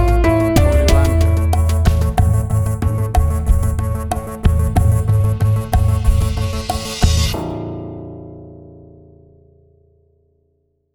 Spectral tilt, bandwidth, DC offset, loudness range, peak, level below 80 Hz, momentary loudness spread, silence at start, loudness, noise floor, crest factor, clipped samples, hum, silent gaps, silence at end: -6.5 dB/octave; 19.5 kHz; under 0.1%; 9 LU; 0 dBFS; -20 dBFS; 12 LU; 0 s; -16 LUFS; -64 dBFS; 16 dB; under 0.1%; none; none; 2.2 s